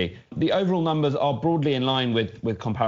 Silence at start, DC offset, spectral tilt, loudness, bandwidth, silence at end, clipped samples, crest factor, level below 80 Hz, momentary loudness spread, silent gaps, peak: 0 s; under 0.1%; -5 dB/octave; -24 LUFS; 7.6 kHz; 0 s; under 0.1%; 14 dB; -56 dBFS; 6 LU; none; -10 dBFS